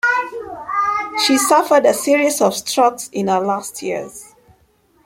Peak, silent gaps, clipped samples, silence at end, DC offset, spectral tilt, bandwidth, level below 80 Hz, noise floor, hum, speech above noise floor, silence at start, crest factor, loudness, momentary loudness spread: -2 dBFS; none; under 0.1%; 0.8 s; under 0.1%; -2.5 dB/octave; 16.5 kHz; -60 dBFS; -57 dBFS; none; 41 dB; 0.05 s; 16 dB; -16 LUFS; 14 LU